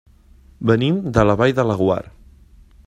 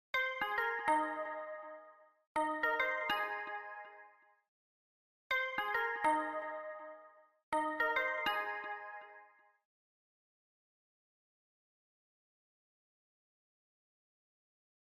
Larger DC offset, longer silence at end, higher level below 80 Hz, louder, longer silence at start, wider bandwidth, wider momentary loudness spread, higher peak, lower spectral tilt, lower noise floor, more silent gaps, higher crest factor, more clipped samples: neither; second, 0.8 s vs 5.65 s; first, -40 dBFS vs -80 dBFS; first, -18 LUFS vs -36 LUFS; first, 0.6 s vs 0.15 s; second, 10.5 kHz vs 15 kHz; second, 6 LU vs 17 LU; first, 0 dBFS vs -22 dBFS; first, -7.5 dB/octave vs -2.5 dB/octave; second, -48 dBFS vs -63 dBFS; second, none vs 2.27-2.35 s, 4.48-5.30 s, 7.43-7.52 s; about the same, 18 dB vs 20 dB; neither